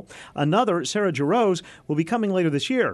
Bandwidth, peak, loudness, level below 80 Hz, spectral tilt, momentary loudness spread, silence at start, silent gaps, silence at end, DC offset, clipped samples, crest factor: 12 kHz; -8 dBFS; -23 LUFS; -64 dBFS; -5.5 dB/octave; 7 LU; 0 s; none; 0 s; under 0.1%; under 0.1%; 14 dB